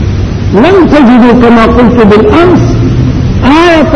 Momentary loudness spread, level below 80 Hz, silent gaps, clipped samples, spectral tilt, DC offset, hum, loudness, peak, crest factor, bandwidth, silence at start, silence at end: 6 LU; -16 dBFS; none; 10%; -7.5 dB/octave; under 0.1%; none; -4 LUFS; 0 dBFS; 4 dB; 9.4 kHz; 0 s; 0 s